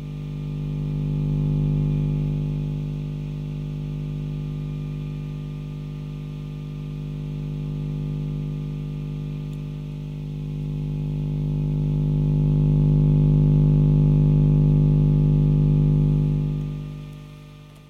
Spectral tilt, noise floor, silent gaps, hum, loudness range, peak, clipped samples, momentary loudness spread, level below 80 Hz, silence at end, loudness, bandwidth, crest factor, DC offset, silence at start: -10.5 dB/octave; -43 dBFS; none; 50 Hz at -25 dBFS; 12 LU; -10 dBFS; under 0.1%; 14 LU; -32 dBFS; 0.1 s; -23 LUFS; 4.1 kHz; 12 dB; under 0.1%; 0 s